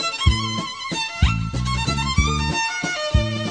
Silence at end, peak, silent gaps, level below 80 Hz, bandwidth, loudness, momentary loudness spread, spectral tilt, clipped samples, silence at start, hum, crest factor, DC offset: 0 s; -4 dBFS; none; -26 dBFS; 10 kHz; -22 LUFS; 5 LU; -4 dB/octave; under 0.1%; 0 s; none; 18 dB; under 0.1%